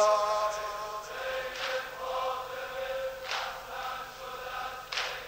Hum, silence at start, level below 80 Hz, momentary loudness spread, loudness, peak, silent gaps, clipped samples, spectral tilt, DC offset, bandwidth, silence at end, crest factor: none; 0 s; -60 dBFS; 8 LU; -34 LUFS; -14 dBFS; none; under 0.1%; -1 dB/octave; under 0.1%; 16 kHz; 0 s; 18 dB